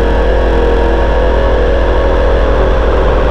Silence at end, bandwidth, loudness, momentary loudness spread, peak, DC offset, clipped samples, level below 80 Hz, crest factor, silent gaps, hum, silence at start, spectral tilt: 0 s; 6.2 kHz; -12 LUFS; 0 LU; 0 dBFS; under 0.1%; under 0.1%; -12 dBFS; 8 dB; none; none; 0 s; -7.5 dB/octave